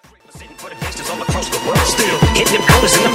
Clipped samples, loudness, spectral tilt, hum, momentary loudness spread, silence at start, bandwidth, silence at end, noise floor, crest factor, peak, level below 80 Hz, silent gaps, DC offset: under 0.1%; -14 LUFS; -3.5 dB/octave; none; 16 LU; 0.35 s; 16.5 kHz; 0 s; -40 dBFS; 16 dB; 0 dBFS; -28 dBFS; none; under 0.1%